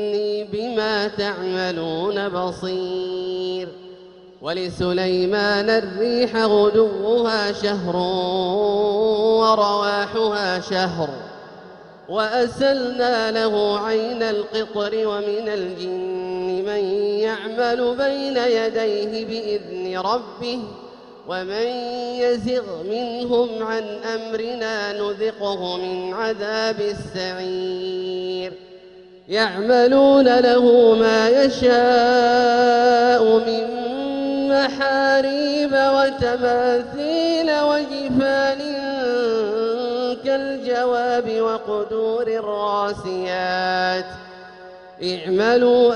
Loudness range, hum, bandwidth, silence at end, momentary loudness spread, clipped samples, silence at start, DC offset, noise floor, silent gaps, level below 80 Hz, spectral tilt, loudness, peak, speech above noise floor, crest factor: 9 LU; none; 10 kHz; 0 s; 11 LU; under 0.1%; 0 s; under 0.1%; -44 dBFS; none; -54 dBFS; -5 dB/octave; -20 LUFS; -4 dBFS; 25 dB; 16 dB